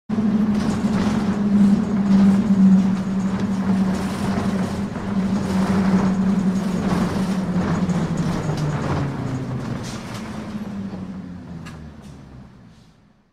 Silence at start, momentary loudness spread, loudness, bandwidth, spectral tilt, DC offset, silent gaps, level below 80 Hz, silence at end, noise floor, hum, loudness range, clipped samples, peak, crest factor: 0.1 s; 15 LU; -21 LUFS; 10.5 kHz; -7.5 dB/octave; under 0.1%; none; -42 dBFS; 0.85 s; -53 dBFS; none; 13 LU; under 0.1%; -6 dBFS; 14 dB